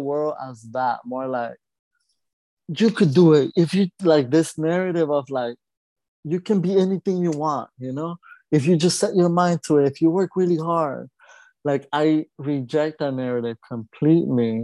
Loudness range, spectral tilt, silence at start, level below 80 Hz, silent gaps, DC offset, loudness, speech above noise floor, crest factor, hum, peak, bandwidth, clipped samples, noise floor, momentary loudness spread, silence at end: 5 LU; -6.5 dB/octave; 0 s; -68 dBFS; 1.79-1.91 s, 2.33-2.57 s, 5.77-5.96 s, 6.08-6.23 s; under 0.1%; -21 LUFS; 31 dB; 18 dB; none; -4 dBFS; 12 kHz; under 0.1%; -52 dBFS; 12 LU; 0 s